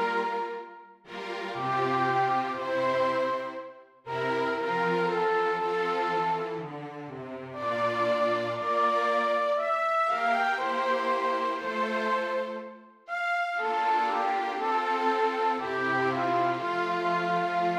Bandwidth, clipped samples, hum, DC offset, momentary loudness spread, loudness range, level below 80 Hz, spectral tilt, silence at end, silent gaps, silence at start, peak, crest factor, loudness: 14.5 kHz; under 0.1%; none; under 0.1%; 11 LU; 3 LU; -78 dBFS; -5.5 dB/octave; 0 s; none; 0 s; -14 dBFS; 14 dB; -28 LUFS